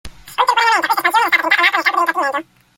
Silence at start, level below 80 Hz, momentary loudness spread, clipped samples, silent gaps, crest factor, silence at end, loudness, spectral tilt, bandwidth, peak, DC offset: 0.05 s; -50 dBFS; 8 LU; under 0.1%; none; 16 dB; 0.35 s; -14 LUFS; -1 dB/octave; 17 kHz; 0 dBFS; under 0.1%